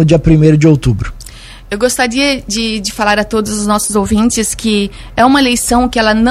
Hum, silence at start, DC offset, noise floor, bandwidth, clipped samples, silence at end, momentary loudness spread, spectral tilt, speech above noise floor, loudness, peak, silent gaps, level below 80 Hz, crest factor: none; 0 s; under 0.1%; -32 dBFS; 15.5 kHz; 0.1%; 0 s; 8 LU; -4.5 dB/octave; 21 dB; -11 LUFS; 0 dBFS; none; -28 dBFS; 12 dB